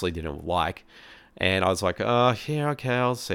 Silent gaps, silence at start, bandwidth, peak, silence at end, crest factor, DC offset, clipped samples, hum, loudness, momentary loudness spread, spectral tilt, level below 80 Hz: none; 0 s; 18 kHz; -6 dBFS; 0 s; 20 dB; under 0.1%; under 0.1%; none; -25 LUFS; 8 LU; -5 dB/octave; -48 dBFS